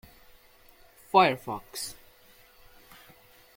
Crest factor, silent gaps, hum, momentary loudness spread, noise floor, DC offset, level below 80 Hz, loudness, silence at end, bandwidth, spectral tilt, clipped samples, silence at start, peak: 24 dB; none; none; 15 LU; -57 dBFS; under 0.1%; -62 dBFS; -27 LUFS; 1.65 s; 17 kHz; -4 dB/octave; under 0.1%; 1.15 s; -6 dBFS